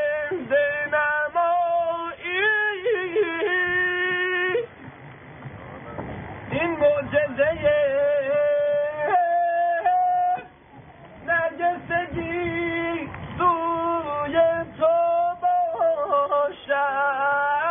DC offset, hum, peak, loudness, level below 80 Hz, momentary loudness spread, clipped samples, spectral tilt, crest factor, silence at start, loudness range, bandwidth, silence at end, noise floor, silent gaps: under 0.1%; none; -8 dBFS; -23 LUFS; -54 dBFS; 13 LU; under 0.1%; 1 dB/octave; 14 dB; 0 s; 4 LU; 3.7 kHz; 0 s; -47 dBFS; none